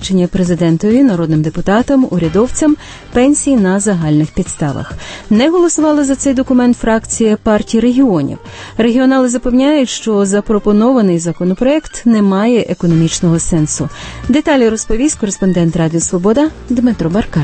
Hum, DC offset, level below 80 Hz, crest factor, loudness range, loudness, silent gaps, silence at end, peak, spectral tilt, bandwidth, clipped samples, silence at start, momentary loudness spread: none; under 0.1%; -32 dBFS; 12 dB; 1 LU; -12 LUFS; none; 0 s; 0 dBFS; -5.5 dB/octave; 8.8 kHz; under 0.1%; 0 s; 6 LU